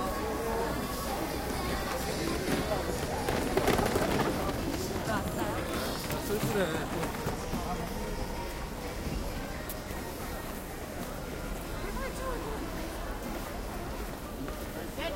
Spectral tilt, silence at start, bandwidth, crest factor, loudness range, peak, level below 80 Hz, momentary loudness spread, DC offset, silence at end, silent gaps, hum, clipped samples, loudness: -4.5 dB/octave; 0 s; 17 kHz; 22 dB; 7 LU; -12 dBFS; -42 dBFS; 9 LU; under 0.1%; 0 s; none; none; under 0.1%; -34 LUFS